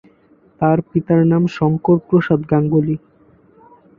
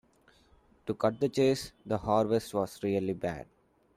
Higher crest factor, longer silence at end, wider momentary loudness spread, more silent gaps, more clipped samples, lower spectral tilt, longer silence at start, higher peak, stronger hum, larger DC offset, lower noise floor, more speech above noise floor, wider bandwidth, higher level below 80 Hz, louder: about the same, 16 dB vs 20 dB; first, 1 s vs 0.55 s; second, 5 LU vs 10 LU; neither; neither; first, -10 dB/octave vs -6 dB/octave; second, 0.6 s vs 0.85 s; first, -2 dBFS vs -12 dBFS; neither; neither; second, -52 dBFS vs -64 dBFS; about the same, 37 dB vs 34 dB; second, 6.8 kHz vs 15.5 kHz; first, -50 dBFS vs -60 dBFS; first, -16 LUFS vs -31 LUFS